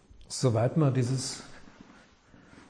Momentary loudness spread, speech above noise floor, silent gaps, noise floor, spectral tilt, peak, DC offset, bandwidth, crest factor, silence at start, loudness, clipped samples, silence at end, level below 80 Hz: 15 LU; 30 dB; none; -57 dBFS; -6 dB/octave; -14 dBFS; under 0.1%; 10.5 kHz; 16 dB; 0.2 s; -28 LUFS; under 0.1%; 1.05 s; -60 dBFS